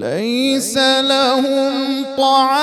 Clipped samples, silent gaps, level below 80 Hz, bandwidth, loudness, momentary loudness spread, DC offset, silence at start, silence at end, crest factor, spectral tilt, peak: under 0.1%; none; -64 dBFS; 15.5 kHz; -15 LUFS; 6 LU; under 0.1%; 0 s; 0 s; 12 dB; -2.5 dB/octave; -2 dBFS